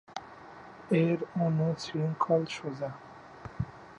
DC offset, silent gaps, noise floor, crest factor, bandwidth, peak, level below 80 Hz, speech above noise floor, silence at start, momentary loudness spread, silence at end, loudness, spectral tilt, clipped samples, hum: under 0.1%; none; -49 dBFS; 18 dB; 9.2 kHz; -14 dBFS; -58 dBFS; 20 dB; 0.1 s; 21 LU; 0 s; -31 LUFS; -7.5 dB/octave; under 0.1%; none